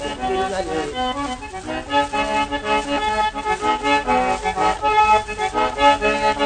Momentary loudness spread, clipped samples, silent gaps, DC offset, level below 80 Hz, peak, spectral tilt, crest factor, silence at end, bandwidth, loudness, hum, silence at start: 8 LU; under 0.1%; none; under 0.1%; -40 dBFS; -2 dBFS; -3.5 dB/octave; 16 dB; 0 s; 9.6 kHz; -19 LUFS; none; 0 s